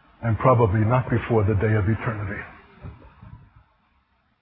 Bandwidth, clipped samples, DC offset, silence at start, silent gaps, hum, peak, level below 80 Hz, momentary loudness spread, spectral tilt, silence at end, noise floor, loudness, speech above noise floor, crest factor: 3.8 kHz; under 0.1%; under 0.1%; 0.2 s; none; none; -4 dBFS; -40 dBFS; 25 LU; -13 dB/octave; 1.05 s; -66 dBFS; -22 LUFS; 45 dB; 20 dB